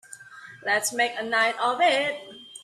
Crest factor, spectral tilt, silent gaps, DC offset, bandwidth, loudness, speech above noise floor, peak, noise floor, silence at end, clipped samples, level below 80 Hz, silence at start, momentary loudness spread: 16 dB; -1 dB/octave; none; under 0.1%; 14.5 kHz; -24 LUFS; 21 dB; -10 dBFS; -46 dBFS; 0 s; under 0.1%; -74 dBFS; 0.1 s; 21 LU